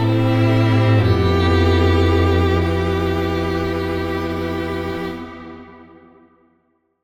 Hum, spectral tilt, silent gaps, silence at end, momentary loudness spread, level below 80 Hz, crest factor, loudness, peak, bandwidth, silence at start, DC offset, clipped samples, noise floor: none; -7.5 dB/octave; none; 1.2 s; 12 LU; -38 dBFS; 14 dB; -18 LUFS; -4 dBFS; 14.5 kHz; 0 s; under 0.1%; under 0.1%; -64 dBFS